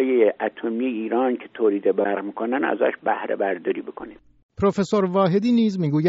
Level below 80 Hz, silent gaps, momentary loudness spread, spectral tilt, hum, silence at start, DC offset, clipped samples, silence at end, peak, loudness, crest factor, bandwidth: -60 dBFS; 4.43-4.49 s; 7 LU; -6 dB/octave; none; 0 s; under 0.1%; under 0.1%; 0 s; -6 dBFS; -22 LUFS; 16 dB; 7.6 kHz